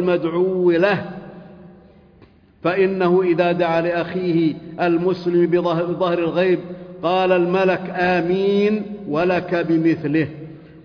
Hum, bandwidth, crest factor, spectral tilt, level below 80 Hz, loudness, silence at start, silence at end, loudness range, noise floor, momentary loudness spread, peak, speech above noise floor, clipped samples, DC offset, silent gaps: none; 5.4 kHz; 14 dB; -8.5 dB/octave; -56 dBFS; -19 LUFS; 0 s; 0.05 s; 2 LU; -50 dBFS; 8 LU; -6 dBFS; 32 dB; under 0.1%; under 0.1%; none